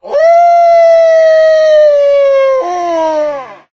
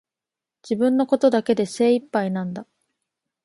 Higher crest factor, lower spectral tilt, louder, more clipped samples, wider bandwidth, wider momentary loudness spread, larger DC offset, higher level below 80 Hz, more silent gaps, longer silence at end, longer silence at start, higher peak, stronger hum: second, 8 dB vs 18 dB; second, -2.5 dB/octave vs -6.5 dB/octave; first, -8 LUFS vs -21 LUFS; neither; second, 6.8 kHz vs 11.5 kHz; about the same, 8 LU vs 10 LU; neither; first, -50 dBFS vs -70 dBFS; neither; second, 0.2 s vs 0.8 s; second, 0.05 s vs 0.65 s; first, 0 dBFS vs -6 dBFS; neither